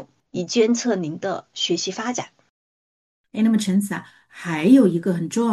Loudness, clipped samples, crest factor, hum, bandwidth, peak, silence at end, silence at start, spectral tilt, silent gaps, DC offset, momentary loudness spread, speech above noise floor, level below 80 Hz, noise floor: -21 LUFS; under 0.1%; 18 dB; none; 12.5 kHz; -4 dBFS; 0 s; 0 s; -5 dB/octave; 2.50-3.24 s; under 0.1%; 16 LU; over 70 dB; -68 dBFS; under -90 dBFS